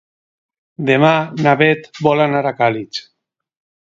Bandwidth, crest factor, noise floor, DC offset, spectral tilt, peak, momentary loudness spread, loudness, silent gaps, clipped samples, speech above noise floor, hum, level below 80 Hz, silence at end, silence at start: 7.6 kHz; 16 dB; -72 dBFS; under 0.1%; -6.5 dB/octave; 0 dBFS; 11 LU; -15 LUFS; none; under 0.1%; 57 dB; none; -62 dBFS; 0.8 s; 0.8 s